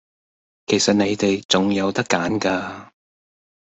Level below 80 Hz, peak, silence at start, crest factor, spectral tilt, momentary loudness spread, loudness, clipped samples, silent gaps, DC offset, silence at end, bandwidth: -58 dBFS; -2 dBFS; 0.7 s; 20 dB; -4 dB/octave; 13 LU; -20 LUFS; under 0.1%; 1.45-1.49 s; under 0.1%; 0.9 s; 8.4 kHz